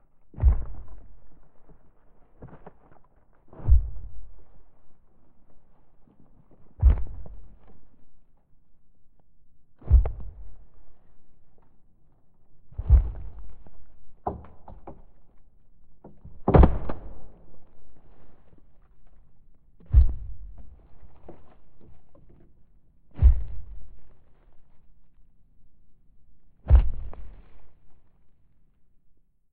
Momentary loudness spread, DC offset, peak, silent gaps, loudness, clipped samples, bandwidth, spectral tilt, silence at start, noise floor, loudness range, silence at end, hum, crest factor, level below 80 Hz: 28 LU; under 0.1%; -2 dBFS; none; -25 LUFS; under 0.1%; 3.4 kHz; -12.5 dB/octave; 0.25 s; -56 dBFS; 6 LU; 0.4 s; none; 26 dB; -30 dBFS